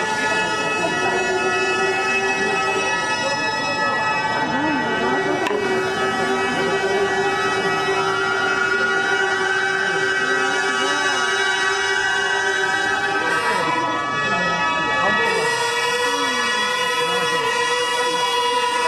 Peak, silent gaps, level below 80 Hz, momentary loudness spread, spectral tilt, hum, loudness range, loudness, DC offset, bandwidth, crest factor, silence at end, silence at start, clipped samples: -6 dBFS; none; -54 dBFS; 2 LU; -2.5 dB/octave; none; 1 LU; -19 LUFS; under 0.1%; 14 kHz; 14 dB; 0 s; 0 s; under 0.1%